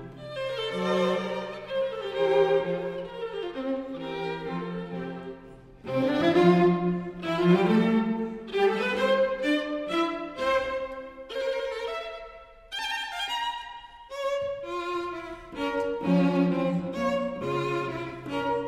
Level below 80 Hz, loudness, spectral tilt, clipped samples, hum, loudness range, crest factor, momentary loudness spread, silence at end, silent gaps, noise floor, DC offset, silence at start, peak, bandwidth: -58 dBFS; -28 LUFS; -6.5 dB/octave; under 0.1%; none; 8 LU; 20 dB; 14 LU; 0 s; none; -48 dBFS; under 0.1%; 0 s; -8 dBFS; 12.5 kHz